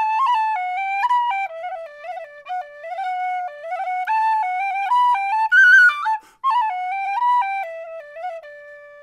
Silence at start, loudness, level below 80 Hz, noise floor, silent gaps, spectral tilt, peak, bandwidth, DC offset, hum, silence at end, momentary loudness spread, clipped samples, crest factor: 0 s; -18 LUFS; -72 dBFS; -41 dBFS; none; 2 dB/octave; -4 dBFS; 13 kHz; under 0.1%; none; 0 s; 19 LU; under 0.1%; 16 dB